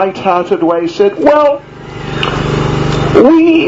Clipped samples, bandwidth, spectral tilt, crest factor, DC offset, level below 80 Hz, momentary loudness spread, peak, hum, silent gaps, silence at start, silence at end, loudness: 0.7%; 8 kHz; -7 dB/octave; 10 dB; under 0.1%; -32 dBFS; 13 LU; 0 dBFS; none; none; 0 s; 0 s; -10 LUFS